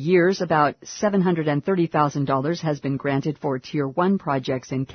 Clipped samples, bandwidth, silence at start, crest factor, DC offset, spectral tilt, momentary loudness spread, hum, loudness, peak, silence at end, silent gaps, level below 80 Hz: under 0.1%; 6.6 kHz; 0 s; 16 dB; under 0.1%; -6.5 dB/octave; 6 LU; none; -22 LUFS; -6 dBFS; 0 s; none; -62 dBFS